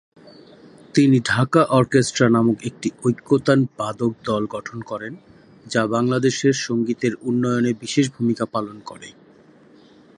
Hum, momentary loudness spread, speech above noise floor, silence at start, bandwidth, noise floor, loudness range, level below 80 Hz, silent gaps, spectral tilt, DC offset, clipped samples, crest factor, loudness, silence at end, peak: none; 14 LU; 30 dB; 0.95 s; 11.5 kHz; -50 dBFS; 5 LU; -58 dBFS; none; -5.5 dB/octave; under 0.1%; under 0.1%; 20 dB; -20 LUFS; 1.05 s; -2 dBFS